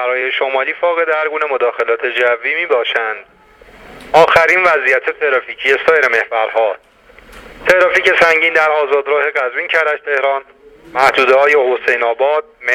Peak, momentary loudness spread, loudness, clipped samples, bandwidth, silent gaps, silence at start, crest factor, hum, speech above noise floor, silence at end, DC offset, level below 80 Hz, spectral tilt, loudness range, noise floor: 0 dBFS; 7 LU; -13 LUFS; under 0.1%; 15.5 kHz; none; 0 s; 14 dB; none; 29 dB; 0 s; under 0.1%; -52 dBFS; -3 dB/octave; 3 LU; -42 dBFS